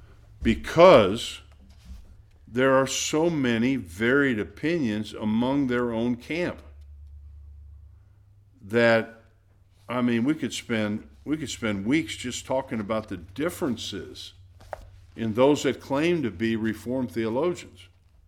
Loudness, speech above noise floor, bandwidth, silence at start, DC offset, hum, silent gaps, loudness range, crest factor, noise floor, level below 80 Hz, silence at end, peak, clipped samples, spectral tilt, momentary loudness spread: -25 LUFS; 34 dB; 16 kHz; 0 s; under 0.1%; none; none; 7 LU; 22 dB; -58 dBFS; -48 dBFS; 0.45 s; -2 dBFS; under 0.1%; -5 dB/octave; 13 LU